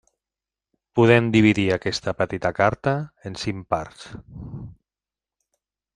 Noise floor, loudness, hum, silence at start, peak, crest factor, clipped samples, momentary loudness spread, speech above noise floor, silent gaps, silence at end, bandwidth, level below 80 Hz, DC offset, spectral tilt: under -90 dBFS; -21 LUFS; none; 0.95 s; -2 dBFS; 22 dB; under 0.1%; 22 LU; over 68 dB; none; 1.25 s; 10.5 kHz; -52 dBFS; under 0.1%; -6.5 dB/octave